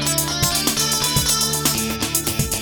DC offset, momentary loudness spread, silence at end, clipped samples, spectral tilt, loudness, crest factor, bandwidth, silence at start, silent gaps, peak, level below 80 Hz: under 0.1%; 4 LU; 0 s; under 0.1%; -2 dB/octave; -18 LUFS; 18 dB; over 20 kHz; 0 s; none; -4 dBFS; -36 dBFS